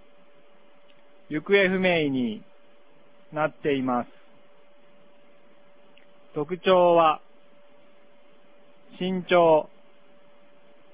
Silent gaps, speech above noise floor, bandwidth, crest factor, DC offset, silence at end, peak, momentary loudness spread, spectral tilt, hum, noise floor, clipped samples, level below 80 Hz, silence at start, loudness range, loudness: none; 36 dB; 4 kHz; 20 dB; 0.4%; 1.3 s; -8 dBFS; 16 LU; -9.5 dB/octave; none; -58 dBFS; under 0.1%; -66 dBFS; 1.3 s; 7 LU; -23 LUFS